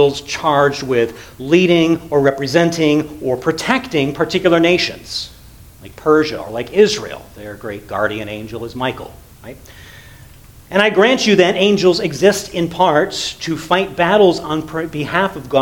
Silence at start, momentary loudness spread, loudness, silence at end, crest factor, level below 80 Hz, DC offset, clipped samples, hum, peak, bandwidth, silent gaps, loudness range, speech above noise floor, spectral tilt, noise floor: 0 s; 15 LU; -15 LUFS; 0 s; 16 dB; -46 dBFS; under 0.1%; under 0.1%; none; 0 dBFS; 19 kHz; none; 7 LU; 25 dB; -5 dB/octave; -41 dBFS